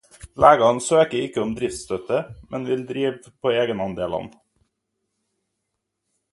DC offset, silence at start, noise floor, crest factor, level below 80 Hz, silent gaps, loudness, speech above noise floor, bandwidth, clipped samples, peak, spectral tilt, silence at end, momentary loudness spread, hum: under 0.1%; 0.2 s; -79 dBFS; 22 dB; -52 dBFS; none; -21 LUFS; 58 dB; 11.5 kHz; under 0.1%; 0 dBFS; -4.5 dB/octave; 2.05 s; 15 LU; none